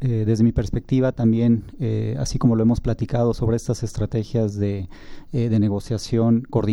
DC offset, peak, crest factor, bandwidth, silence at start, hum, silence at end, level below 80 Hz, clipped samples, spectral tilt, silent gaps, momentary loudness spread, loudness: under 0.1%; -6 dBFS; 14 dB; 11.5 kHz; 0 s; none; 0 s; -36 dBFS; under 0.1%; -8 dB/octave; none; 7 LU; -22 LUFS